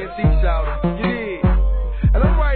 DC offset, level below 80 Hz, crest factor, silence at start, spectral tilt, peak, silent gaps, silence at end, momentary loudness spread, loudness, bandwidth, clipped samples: 0.4%; -18 dBFS; 12 dB; 0 s; -11.5 dB/octave; -4 dBFS; none; 0 s; 5 LU; -19 LUFS; 4.4 kHz; under 0.1%